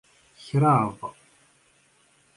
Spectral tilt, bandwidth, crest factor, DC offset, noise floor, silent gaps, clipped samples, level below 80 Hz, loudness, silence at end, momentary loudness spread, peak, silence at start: -8 dB/octave; 11.5 kHz; 20 dB; under 0.1%; -62 dBFS; none; under 0.1%; -64 dBFS; -23 LUFS; 1.25 s; 20 LU; -8 dBFS; 0.45 s